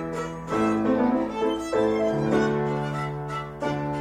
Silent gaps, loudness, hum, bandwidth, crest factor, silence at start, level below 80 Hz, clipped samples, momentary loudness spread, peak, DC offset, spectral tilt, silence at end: none; -25 LUFS; none; 15 kHz; 14 dB; 0 s; -50 dBFS; under 0.1%; 8 LU; -10 dBFS; under 0.1%; -7 dB/octave; 0 s